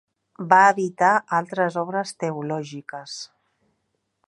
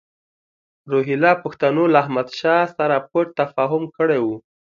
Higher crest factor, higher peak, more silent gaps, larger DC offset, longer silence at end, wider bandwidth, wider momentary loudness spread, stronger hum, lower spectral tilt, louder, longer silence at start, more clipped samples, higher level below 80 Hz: about the same, 22 dB vs 20 dB; about the same, -2 dBFS vs 0 dBFS; neither; neither; first, 1.05 s vs 0.3 s; first, 11.5 kHz vs 7.2 kHz; first, 20 LU vs 6 LU; neither; second, -5 dB/octave vs -7.5 dB/octave; about the same, -21 LUFS vs -19 LUFS; second, 0.4 s vs 0.85 s; neither; second, -76 dBFS vs -68 dBFS